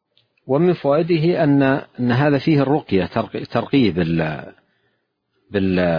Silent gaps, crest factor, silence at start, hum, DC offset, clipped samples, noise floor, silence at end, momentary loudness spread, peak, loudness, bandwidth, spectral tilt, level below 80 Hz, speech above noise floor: none; 16 dB; 0.45 s; none; under 0.1%; under 0.1%; -70 dBFS; 0 s; 8 LU; -4 dBFS; -18 LUFS; 5.2 kHz; -9.5 dB/octave; -50 dBFS; 52 dB